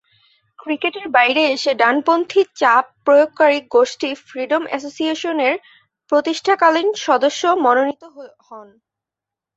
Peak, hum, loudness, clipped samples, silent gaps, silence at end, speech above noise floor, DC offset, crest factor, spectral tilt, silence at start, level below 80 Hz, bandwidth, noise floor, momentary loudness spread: -2 dBFS; none; -17 LUFS; under 0.1%; none; 0.95 s; 69 dB; under 0.1%; 16 dB; -2 dB/octave; 0.65 s; -68 dBFS; 8 kHz; -86 dBFS; 10 LU